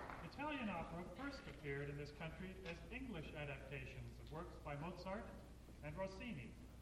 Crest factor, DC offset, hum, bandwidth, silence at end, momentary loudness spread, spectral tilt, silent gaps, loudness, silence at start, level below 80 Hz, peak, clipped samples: 16 dB; under 0.1%; none; 16 kHz; 0 s; 7 LU; -6.5 dB/octave; none; -51 LUFS; 0 s; -60 dBFS; -34 dBFS; under 0.1%